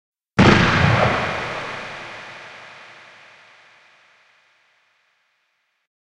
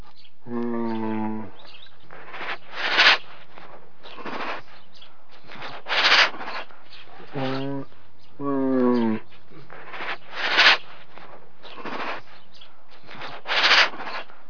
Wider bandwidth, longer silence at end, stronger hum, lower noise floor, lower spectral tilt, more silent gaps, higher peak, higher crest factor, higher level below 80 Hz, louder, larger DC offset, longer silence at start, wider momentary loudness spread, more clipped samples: first, 11 kHz vs 5.4 kHz; first, 3.25 s vs 0.25 s; neither; first, -70 dBFS vs -54 dBFS; first, -6 dB/octave vs -3 dB/octave; neither; about the same, 0 dBFS vs 0 dBFS; about the same, 22 dB vs 26 dB; first, -40 dBFS vs -70 dBFS; first, -18 LUFS vs -21 LUFS; second, under 0.1% vs 4%; about the same, 0.35 s vs 0.45 s; first, 26 LU vs 23 LU; neither